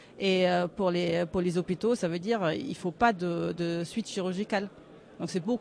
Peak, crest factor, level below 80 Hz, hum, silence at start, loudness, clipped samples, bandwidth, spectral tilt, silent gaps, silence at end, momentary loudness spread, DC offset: -12 dBFS; 18 dB; -60 dBFS; none; 0 s; -29 LUFS; under 0.1%; 11 kHz; -6 dB/octave; none; 0 s; 7 LU; under 0.1%